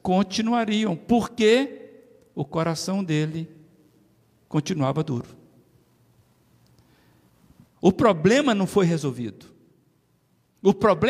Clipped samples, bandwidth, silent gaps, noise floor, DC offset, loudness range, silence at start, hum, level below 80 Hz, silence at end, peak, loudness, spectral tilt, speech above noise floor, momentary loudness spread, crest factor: under 0.1%; 14.5 kHz; none; -65 dBFS; under 0.1%; 8 LU; 0.05 s; none; -58 dBFS; 0 s; -6 dBFS; -23 LUFS; -6 dB/octave; 43 dB; 15 LU; 20 dB